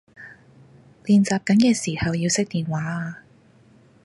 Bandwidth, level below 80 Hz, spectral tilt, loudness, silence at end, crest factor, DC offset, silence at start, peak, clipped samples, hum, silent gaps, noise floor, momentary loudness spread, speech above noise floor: 11.5 kHz; -52 dBFS; -5 dB/octave; -21 LUFS; 0.9 s; 18 dB; under 0.1%; 0.2 s; -6 dBFS; under 0.1%; none; none; -54 dBFS; 21 LU; 33 dB